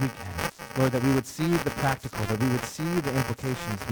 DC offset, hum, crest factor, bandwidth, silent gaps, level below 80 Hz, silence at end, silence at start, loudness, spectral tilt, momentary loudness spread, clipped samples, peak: under 0.1%; none; 16 dB; over 20 kHz; none; -48 dBFS; 0 s; 0 s; -28 LUFS; -5.5 dB/octave; 7 LU; under 0.1%; -10 dBFS